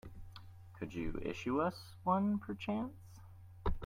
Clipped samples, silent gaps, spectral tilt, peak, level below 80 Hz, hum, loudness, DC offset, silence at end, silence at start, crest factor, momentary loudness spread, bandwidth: under 0.1%; none; -7.5 dB/octave; -20 dBFS; -50 dBFS; none; -39 LUFS; under 0.1%; 0 s; 0.05 s; 18 dB; 23 LU; 15.5 kHz